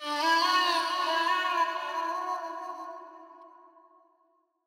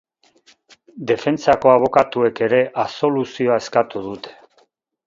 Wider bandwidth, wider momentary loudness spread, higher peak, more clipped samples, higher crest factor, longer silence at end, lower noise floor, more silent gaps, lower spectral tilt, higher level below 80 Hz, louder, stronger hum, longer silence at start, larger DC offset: first, 17.5 kHz vs 7.6 kHz; about the same, 18 LU vs 16 LU; second, -14 dBFS vs 0 dBFS; neither; about the same, 16 dB vs 20 dB; first, 1.2 s vs 0.75 s; first, -71 dBFS vs -60 dBFS; neither; second, 2 dB/octave vs -6 dB/octave; second, under -90 dBFS vs -56 dBFS; second, -27 LUFS vs -18 LUFS; neither; second, 0 s vs 0.95 s; neither